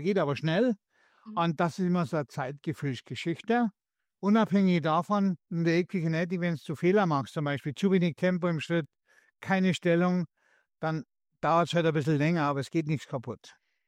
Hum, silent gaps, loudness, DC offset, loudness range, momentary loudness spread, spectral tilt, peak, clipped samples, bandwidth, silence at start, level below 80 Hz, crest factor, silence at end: none; none; -29 LUFS; under 0.1%; 3 LU; 10 LU; -7 dB/octave; -14 dBFS; under 0.1%; 10.5 kHz; 0 s; -70 dBFS; 14 dB; 0.4 s